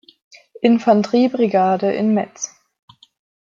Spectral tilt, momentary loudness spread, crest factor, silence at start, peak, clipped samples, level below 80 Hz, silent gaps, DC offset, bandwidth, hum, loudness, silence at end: -5.5 dB/octave; 12 LU; 16 dB; 0.6 s; -2 dBFS; under 0.1%; -68 dBFS; none; under 0.1%; 7.6 kHz; none; -17 LUFS; 1.05 s